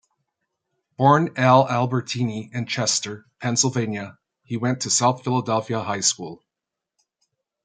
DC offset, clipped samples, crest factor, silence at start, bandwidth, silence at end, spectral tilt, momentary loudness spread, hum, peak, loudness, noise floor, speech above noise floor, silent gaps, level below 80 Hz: under 0.1%; under 0.1%; 20 dB; 1 s; 9.6 kHz; 1.3 s; -4 dB/octave; 14 LU; none; -2 dBFS; -21 LUFS; -86 dBFS; 64 dB; none; -66 dBFS